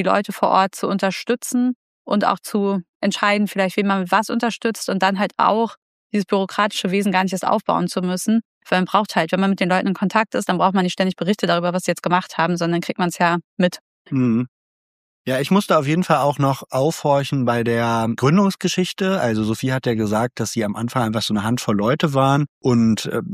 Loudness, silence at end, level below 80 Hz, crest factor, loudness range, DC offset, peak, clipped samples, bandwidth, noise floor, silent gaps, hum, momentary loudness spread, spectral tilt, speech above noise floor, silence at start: -20 LUFS; 0 s; -60 dBFS; 18 dB; 2 LU; under 0.1%; -2 dBFS; under 0.1%; 15.5 kHz; under -90 dBFS; 1.75-2.05 s, 2.89-3.00 s, 5.77-6.10 s, 8.45-8.61 s, 13.44-13.57 s, 13.81-14.05 s, 14.48-15.25 s, 22.49-22.61 s; none; 5 LU; -5.5 dB/octave; over 71 dB; 0 s